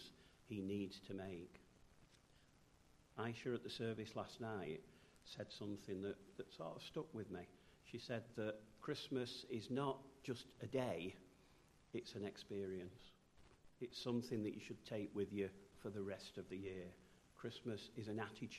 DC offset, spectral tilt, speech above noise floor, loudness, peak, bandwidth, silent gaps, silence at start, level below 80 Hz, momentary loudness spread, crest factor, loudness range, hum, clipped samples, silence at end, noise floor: under 0.1%; -6 dB/octave; 23 dB; -49 LUFS; -28 dBFS; 13 kHz; none; 0 s; -76 dBFS; 13 LU; 22 dB; 4 LU; none; under 0.1%; 0 s; -71 dBFS